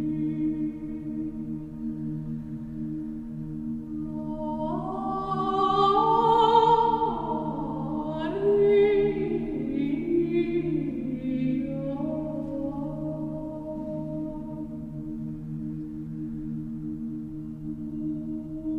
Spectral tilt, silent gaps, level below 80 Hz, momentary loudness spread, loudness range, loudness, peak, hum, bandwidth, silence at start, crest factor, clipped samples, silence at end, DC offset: -8.5 dB/octave; none; -48 dBFS; 14 LU; 11 LU; -28 LUFS; -8 dBFS; none; 7.8 kHz; 0 s; 20 dB; under 0.1%; 0 s; under 0.1%